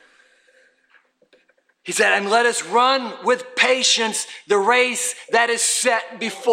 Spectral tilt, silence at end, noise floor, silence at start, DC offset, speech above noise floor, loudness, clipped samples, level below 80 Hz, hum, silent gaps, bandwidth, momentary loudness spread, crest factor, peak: -0.5 dB/octave; 0 s; -62 dBFS; 1.85 s; under 0.1%; 42 dB; -18 LUFS; under 0.1%; -76 dBFS; none; none; 16.5 kHz; 8 LU; 18 dB; -2 dBFS